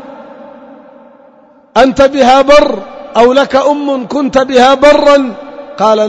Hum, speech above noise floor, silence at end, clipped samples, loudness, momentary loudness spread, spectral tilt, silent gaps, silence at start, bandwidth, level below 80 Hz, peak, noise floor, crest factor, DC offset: none; 35 dB; 0 s; 2%; -8 LUFS; 11 LU; -4 dB/octave; none; 0 s; 11 kHz; -36 dBFS; 0 dBFS; -42 dBFS; 10 dB; under 0.1%